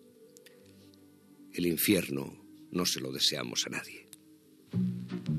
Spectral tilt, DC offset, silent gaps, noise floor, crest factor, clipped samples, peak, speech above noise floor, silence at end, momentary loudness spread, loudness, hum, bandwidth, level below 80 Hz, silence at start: -3.5 dB/octave; under 0.1%; none; -59 dBFS; 22 dB; under 0.1%; -14 dBFS; 28 dB; 0 s; 17 LU; -31 LUFS; none; 14.5 kHz; -70 dBFS; 0.2 s